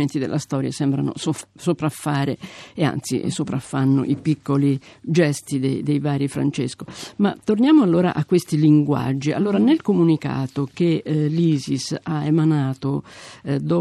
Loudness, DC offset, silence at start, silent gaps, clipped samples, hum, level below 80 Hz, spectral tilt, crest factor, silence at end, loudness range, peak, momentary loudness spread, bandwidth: -21 LUFS; under 0.1%; 0 s; none; under 0.1%; none; -60 dBFS; -7 dB/octave; 16 dB; 0 s; 5 LU; -4 dBFS; 9 LU; 13.5 kHz